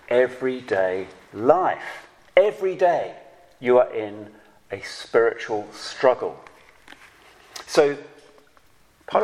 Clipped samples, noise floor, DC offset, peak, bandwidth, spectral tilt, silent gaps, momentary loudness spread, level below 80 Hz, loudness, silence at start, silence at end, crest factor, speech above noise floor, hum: under 0.1%; -58 dBFS; under 0.1%; 0 dBFS; 14 kHz; -4.5 dB/octave; none; 18 LU; -64 dBFS; -22 LUFS; 0.1 s; 0 s; 22 dB; 36 dB; none